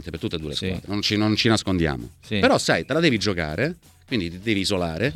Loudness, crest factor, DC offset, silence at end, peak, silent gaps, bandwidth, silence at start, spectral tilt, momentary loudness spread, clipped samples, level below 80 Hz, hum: -23 LUFS; 20 dB; under 0.1%; 0 s; -4 dBFS; none; 15.5 kHz; 0 s; -5 dB/octave; 9 LU; under 0.1%; -44 dBFS; none